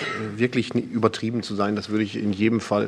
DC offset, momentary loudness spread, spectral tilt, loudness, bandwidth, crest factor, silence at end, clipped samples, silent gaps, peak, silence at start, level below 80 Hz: under 0.1%; 4 LU; -6 dB/octave; -24 LUFS; 11 kHz; 20 dB; 0 s; under 0.1%; none; -4 dBFS; 0 s; -62 dBFS